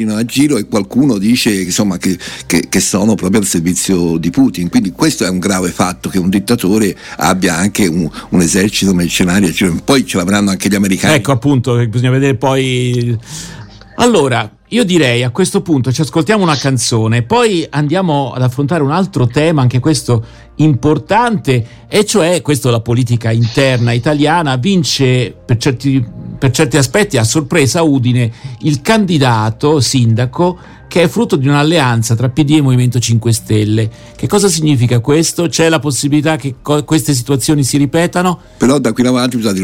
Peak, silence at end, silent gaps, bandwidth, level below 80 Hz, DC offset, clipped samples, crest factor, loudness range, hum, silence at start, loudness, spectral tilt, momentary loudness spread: 0 dBFS; 0 s; none; 16.5 kHz; -40 dBFS; under 0.1%; under 0.1%; 12 dB; 1 LU; none; 0 s; -12 LUFS; -5 dB/octave; 5 LU